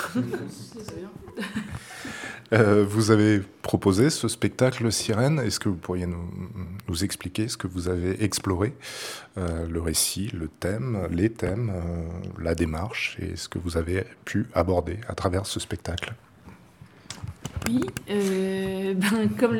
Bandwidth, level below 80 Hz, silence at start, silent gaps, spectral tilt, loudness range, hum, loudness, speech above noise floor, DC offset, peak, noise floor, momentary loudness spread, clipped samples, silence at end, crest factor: 18 kHz; -46 dBFS; 0 s; none; -5 dB/octave; 7 LU; none; -26 LUFS; 25 dB; under 0.1%; -2 dBFS; -50 dBFS; 15 LU; under 0.1%; 0 s; 24 dB